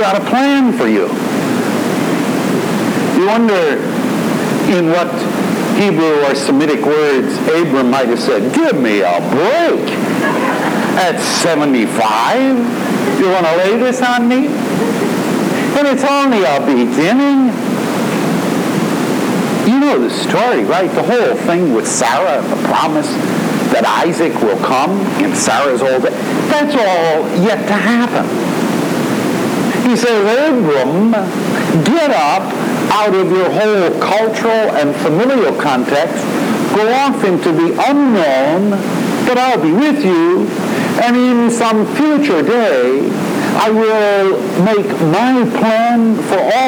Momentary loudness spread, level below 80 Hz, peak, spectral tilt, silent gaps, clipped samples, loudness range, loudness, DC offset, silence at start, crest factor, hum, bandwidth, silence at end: 4 LU; -60 dBFS; 0 dBFS; -5 dB/octave; none; under 0.1%; 1 LU; -13 LUFS; under 0.1%; 0 s; 12 dB; none; over 20 kHz; 0 s